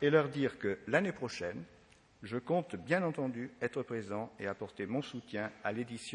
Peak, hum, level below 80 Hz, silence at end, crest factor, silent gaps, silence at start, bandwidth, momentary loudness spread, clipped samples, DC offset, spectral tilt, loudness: -14 dBFS; none; -74 dBFS; 0 s; 24 dB; none; 0 s; 10.5 kHz; 9 LU; under 0.1%; under 0.1%; -6 dB/octave; -37 LUFS